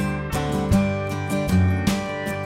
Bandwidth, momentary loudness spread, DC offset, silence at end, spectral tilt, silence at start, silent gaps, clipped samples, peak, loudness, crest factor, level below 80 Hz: 16 kHz; 5 LU; under 0.1%; 0 s; -6.5 dB/octave; 0 s; none; under 0.1%; -6 dBFS; -23 LUFS; 16 dB; -36 dBFS